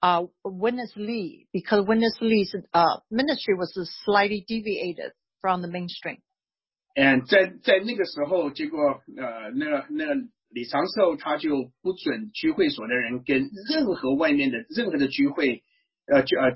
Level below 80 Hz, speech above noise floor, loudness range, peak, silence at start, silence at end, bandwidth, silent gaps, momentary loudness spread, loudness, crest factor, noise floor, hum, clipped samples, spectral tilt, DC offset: -64 dBFS; over 66 dB; 4 LU; -6 dBFS; 0 s; 0 s; 5.8 kHz; none; 11 LU; -25 LUFS; 18 dB; under -90 dBFS; none; under 0.1%; -9 dB/octave; under 0.1%